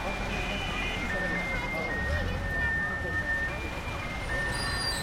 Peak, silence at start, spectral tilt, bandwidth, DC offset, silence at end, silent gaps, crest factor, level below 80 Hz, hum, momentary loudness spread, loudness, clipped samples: -18 dBFS; 0 s; -4 dB/octave; 16.5 kHz; under 0.1%; 0 s; none; 12 dB; -38 dBFS; none; 5 LU; -30 LUFS; under 0.1%